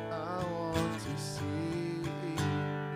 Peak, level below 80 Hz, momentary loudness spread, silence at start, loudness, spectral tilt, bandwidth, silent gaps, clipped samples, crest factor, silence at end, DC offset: -18 dBFS; -60 dBFS; 4 LU; 0 s; -35 LUFS; -6 dB/octave; 15.5 kHz; none; under 0.1%; 16 dB; 0 s; under 0.1%